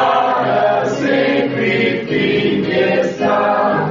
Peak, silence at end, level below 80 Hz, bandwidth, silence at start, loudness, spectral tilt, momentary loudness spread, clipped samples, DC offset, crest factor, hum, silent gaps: -4 dBFS; 0 s; -52 dBFS; 7.6 kHz; 0 s; -15 LUFS; -6 dB/octave; 2 LU; under 0.1%; under 0.1%; 12 dB; none; none